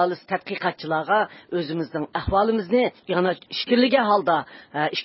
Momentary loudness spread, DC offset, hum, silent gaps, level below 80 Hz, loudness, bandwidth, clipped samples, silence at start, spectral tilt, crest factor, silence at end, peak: 9 LU; under 0.1%; none; none; -48 dBFS; -23 LUFS; 5.8 kHz; under 0.1%; 0 s; -9.5 dB/octave; 18 dB; 0 s; -6 dBFS